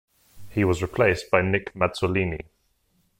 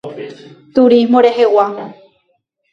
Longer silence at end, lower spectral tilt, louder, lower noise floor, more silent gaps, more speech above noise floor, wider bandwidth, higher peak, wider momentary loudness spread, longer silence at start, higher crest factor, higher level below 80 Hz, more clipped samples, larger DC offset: about the same, 0.8 s vs 0.8 s; about the same, -6.5 dB/octave vs -6.5 dB/octave; second, -24 LUFS vs -11 LUFS; first, -68 dBFS vs -64 dBFS; neither; second, 44 dB vs 52 dB; first, 16.5 kHz vs 7.2 kHz; second, -6 dBFS vs 0 dBFS; second, 8 LU vs 21 LU; first, 0.35 s vs 0.05 s; first, 20 dB vs 14 dB; first, -46 dBFS vs -60 dBFS; neither; neither